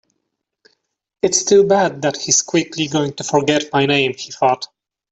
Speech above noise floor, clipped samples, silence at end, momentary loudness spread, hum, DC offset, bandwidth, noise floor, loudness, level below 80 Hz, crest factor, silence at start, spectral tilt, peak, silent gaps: 59 dB; under 0.1%; 0.45 s; 8 LU; none; under 0.1%; 8.4 kHz; -75 dBFS; -16 LUFS; -58 dBFS; 16 dB; 1.25 s; -3 dB/octave; -2 dBFS; none